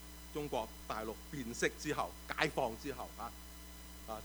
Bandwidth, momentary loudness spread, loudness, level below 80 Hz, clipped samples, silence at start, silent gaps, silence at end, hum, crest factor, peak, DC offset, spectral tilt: over 20 kHz; 15 LU; -40 LUFS; -54 dBFS; under 0.1%; 0 s; none; 0 s; none; 28 dB; -14 dBFS; under 0.1%; -4 dB/octave